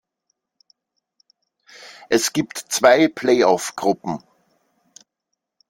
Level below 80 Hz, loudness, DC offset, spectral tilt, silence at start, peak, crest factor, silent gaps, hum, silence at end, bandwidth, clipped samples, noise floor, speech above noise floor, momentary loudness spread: -64 dBFS; -18 LUFS; under 0.1%; -3.5 dB/octave; 1.8 s; -2 dBFS; 20 dB; none; none; 1.5 s; 16.5 kHz; under 0.1%; -79 dBFS; 61 dB; 17 LU